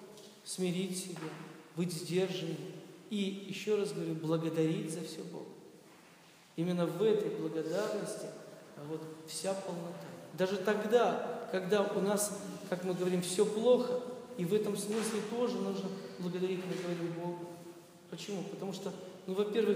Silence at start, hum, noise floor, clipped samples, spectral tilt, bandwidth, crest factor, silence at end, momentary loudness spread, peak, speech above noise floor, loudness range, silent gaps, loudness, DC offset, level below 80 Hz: 0 s; none; -60 dBFS; under 0.1%; -5 dB/octave; 15.5 kHz; 20 dB; 0 s; 16 LU; -16 dBFS; 25 dB; 6 LU; none; -35 LUFS; under 0.1%; -86 dBFS